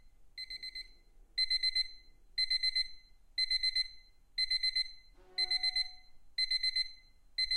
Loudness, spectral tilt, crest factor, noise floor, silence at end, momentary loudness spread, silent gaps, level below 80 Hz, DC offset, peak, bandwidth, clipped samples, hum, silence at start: -33 LUFS; 2 dB/octave; 14 dB; -59 dBFS; 0 s; 12 LU; none; -58 dBFS; under 0.1%; -22 dBFS; 14 kHz; under 0.1%; none; 0.05 s